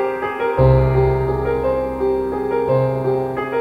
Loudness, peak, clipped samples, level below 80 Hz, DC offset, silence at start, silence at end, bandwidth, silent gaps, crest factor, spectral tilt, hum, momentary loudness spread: -18 LUFS; -2 dBFS; under 0.1%; -30 dBFS; under 0.1%; 0 s; 0 s; 4.8 kHz; none; 16 dB; -9.5 dB/octave; none; 7 LU